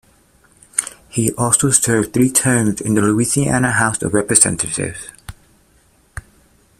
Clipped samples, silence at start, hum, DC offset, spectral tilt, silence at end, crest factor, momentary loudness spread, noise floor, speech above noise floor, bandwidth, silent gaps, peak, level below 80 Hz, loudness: under 0.1%; 0.75 s; none; under 0.1%; -4 dB/octave; 0.6 s; 18 dB; 20 LU; -54 dBFS; 39 dB; 16 kHz; none; 0 dBFS; -44 dBFS; -15 LUFS